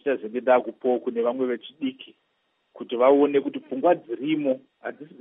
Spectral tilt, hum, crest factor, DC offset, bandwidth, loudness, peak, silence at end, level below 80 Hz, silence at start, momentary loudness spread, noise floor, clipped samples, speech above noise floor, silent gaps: -4 dB/octave; none; 18 dB; under 0.1%; 3.9 kHz; -24 LUFS; -6 dBFS; 0.15 s; -84 dBFS; 0.05 s; 13 LU; -72 dBFS; under 0.1%; 48 dB; none